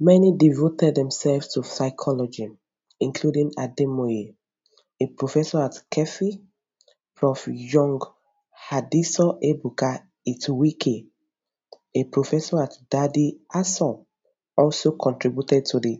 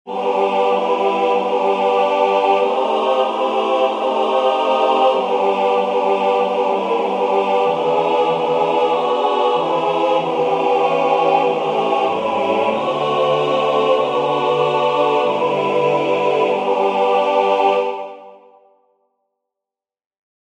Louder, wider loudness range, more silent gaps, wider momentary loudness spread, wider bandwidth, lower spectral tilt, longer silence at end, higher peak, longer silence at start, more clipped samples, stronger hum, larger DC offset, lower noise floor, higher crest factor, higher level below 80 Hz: second, -23 LUFS vs -17 LUFS; about the same, 3 LU vs 1 LU; neither; first, 9 LU vs 3 LU; second, 8 kHz vs 9.4 kHz; first, -7 dB/octave vs -5.5 dB/octave; second, 0 s vs 2.05 s; about the same, -4 dBFS vs -2 dBFS; about the same, 0 s vs 0.05 s; neither; neither; neither; second, -82 dBFS vs -87 dBFS; first, 20 dB vs 14 dB; about the same, -66 dBFS vs -68 dBFS